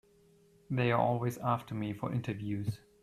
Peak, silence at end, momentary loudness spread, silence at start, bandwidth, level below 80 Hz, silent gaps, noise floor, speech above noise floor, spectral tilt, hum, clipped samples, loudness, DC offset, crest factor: -16 dBFS; 0.25 s; 9 LU; 0.7 s; 14 kHz; -64 dBFS; none; -64 dBFS; 31 dB; -7.5 dB/octave; none; under 0.1%; -34 LUFS; under 0.1%; 18 dB